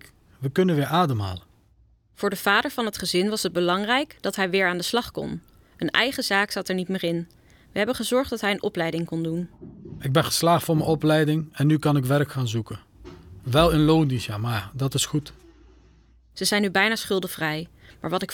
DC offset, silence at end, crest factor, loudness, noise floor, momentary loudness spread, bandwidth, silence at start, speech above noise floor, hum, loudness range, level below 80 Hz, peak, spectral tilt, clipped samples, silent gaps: under 0.1%; 0 s; 22 dB; -24 LUFS; -59 dBFS; 13 LU; 19 kHz; 0.4 s; 36 dB; none; 3 LU; -48 dBFS; -4 dBFS; -5 dB/octave; under 0.1%; none